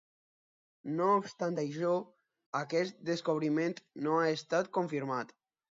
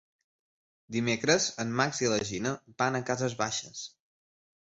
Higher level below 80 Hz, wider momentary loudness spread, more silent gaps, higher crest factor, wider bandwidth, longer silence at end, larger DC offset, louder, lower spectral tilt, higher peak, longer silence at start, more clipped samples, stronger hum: second, -84 dBFS vs -64 dBFS; about the same, 9 LU vs 10 LU; first, 2.46-2.53 s vs none; about the same, 18 dB vs 22 dB; about the same, 7.8 kHz vs 8.2 kHz; second, 0.5 s vs 0.8 s; neither; second, -33 LUFS vs -29 LUFS; first, -6 dB/octave vs -3.5 dB/octave; second, -16 dBFS vs -10 dBFS; about the same, 0.85 s vs 0.9 s; neither; neither